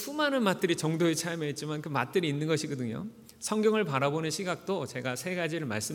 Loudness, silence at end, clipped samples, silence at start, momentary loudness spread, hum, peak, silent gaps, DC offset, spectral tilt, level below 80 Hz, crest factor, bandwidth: -30 LUFS; 0 s; under 0.1%; 0 s; 8 LU; none; -12 dBFS; none; under 0.1%; -4.5 dB/octave; -72 dBFS; 18 dB; 19 kHz